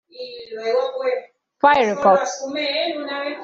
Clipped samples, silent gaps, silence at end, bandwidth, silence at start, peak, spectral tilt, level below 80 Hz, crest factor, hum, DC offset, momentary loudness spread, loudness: under 0.1%; none; 0 s; 7.8 kHz; 0.15 s; -2 dBFS; -3 dB/octave; -62 dBFS; 20 dB; none; under 0.1%; 13 LU; -20 LUFS